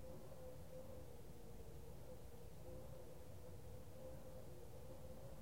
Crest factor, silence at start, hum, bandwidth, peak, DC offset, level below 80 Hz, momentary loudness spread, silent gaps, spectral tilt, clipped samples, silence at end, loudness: 12 dB; 0 s; none; 16 kHz; -42 dBFS; 0.2%; -64 dBFS; 2 LU; none; -6 dB/octave; under 0.1%; 0 s; -58 LUFS